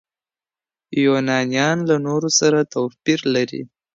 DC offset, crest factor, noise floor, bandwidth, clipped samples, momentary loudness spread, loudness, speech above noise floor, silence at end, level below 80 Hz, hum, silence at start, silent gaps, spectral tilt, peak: under 0.1%; 16 dB; under -90 dBFS; 7.8 kHz; under 0.1%; 8 LU; -19 LUFS; over 72 dB; 0.3 s; -66 dBFS; none; 0.9 s; none; -4 dB/octave; -4 dBFS